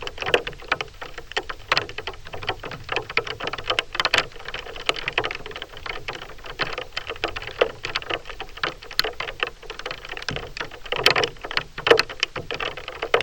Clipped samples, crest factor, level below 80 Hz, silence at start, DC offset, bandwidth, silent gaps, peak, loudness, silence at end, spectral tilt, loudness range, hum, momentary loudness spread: under 0.1%; 26 dB; -44 dBFS; 0 s; under 0.1%; 18.5 kHz; none; 0 dBFS; -25 LUFS; 0 s; -2.5 dB/octave; 5 LU; none; 14 LU